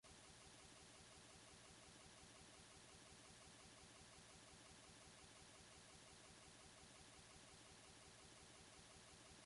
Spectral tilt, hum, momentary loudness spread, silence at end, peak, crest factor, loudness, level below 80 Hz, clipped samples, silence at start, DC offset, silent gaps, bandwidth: -2.5 dB/octave; none; 0 LU; 0 s; -50 dBFS; 16 dB; -63 LUFS; -78 dBFS; under 0.1%; 0.05 s; under 0.1%; none; 11.5 kHz